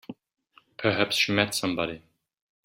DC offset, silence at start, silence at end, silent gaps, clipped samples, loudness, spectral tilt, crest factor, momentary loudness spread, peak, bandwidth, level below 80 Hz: under 0.1%; 0.1 s; 0.65 s; none; under 0.1%; -25 LUFS; -3.5 dB/octave; 24 dB; 16 LU; -4 dBFS; 16 kHz; -64 dBFS